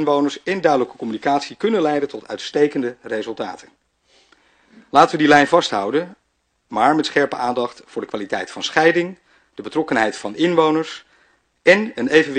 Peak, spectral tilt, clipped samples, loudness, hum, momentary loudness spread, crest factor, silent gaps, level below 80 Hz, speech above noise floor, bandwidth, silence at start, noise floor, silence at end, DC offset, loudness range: 0 dBFS; -4.5 dB/octave; under 0.1%; -18 LUFS; none; 13 LU; 20 dB; none; -62 dBFS; 50 dB; 9.6 kHz; 0 s; -68 dBFS; 0 s; under 0.1%; 5 LU